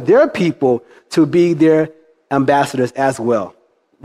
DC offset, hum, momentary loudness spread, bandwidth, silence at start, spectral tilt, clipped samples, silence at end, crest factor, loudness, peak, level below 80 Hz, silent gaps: under 0.1%; none; 8 LU; 12.5 kHz; 0 s; -6.5 dB/octave; under 0.1%; 0.55 s; 14 dB; -15 LUFS; -2 dBFS; -58 dBFS; none